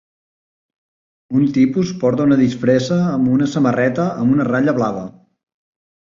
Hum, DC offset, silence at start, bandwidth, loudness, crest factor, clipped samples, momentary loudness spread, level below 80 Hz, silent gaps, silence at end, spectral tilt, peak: none; under 0.1%; 1.3 s; 7.4 kHz; -16 LUFS; 14 dB; under 0.1%; 5 LU; -54 dBFS; none; 1 s; -7.5 dB/octave; -2 dBFS